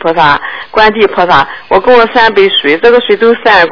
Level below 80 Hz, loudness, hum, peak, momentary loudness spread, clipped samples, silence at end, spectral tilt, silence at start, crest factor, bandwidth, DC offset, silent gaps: -36 dBFS; -7 LUFS; none; 0 dBFS; 4 LU; 5%; 0 s; -5.5 dB/octave; 0 s; 8 dB; 5.4 kHz; 2%; none